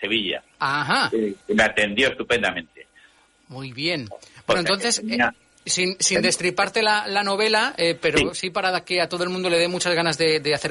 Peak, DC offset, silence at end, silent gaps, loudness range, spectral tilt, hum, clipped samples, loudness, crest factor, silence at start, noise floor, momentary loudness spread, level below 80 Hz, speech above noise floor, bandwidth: -6 dBFS; under 0.1%; 0 s; none; 4 LU; -2.5 dB/octave; none; under 0.1%; -21 LUFS; 16 dB; 0 s; -56 dBFS; 7 LU; -52 dBFS; 34 dB; 11.5 kHz